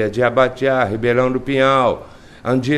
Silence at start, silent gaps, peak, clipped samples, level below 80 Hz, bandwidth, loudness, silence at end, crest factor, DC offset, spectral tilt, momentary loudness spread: 0 s; none; 0 dBFS; under 0.1%; -46 dBFS; 11.5 kHz; -16 LUFS; 0 s; 16 dB; under 0.1%; -6.5 dB/octave; 6 LU